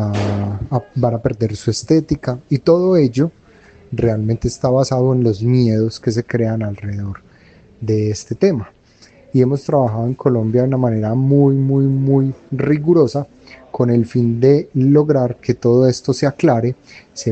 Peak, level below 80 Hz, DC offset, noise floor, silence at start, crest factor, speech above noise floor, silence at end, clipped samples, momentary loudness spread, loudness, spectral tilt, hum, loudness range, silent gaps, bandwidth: 0 dBFS; -44 dBFS; under 0.1%; -48 dBFS; 0 s; 16 dB; 32 dB; 0 s; under 0.1%; 10 LU; -16 LUFS; -8 dB/octave; none; 4 LU; none; 8.6 kHz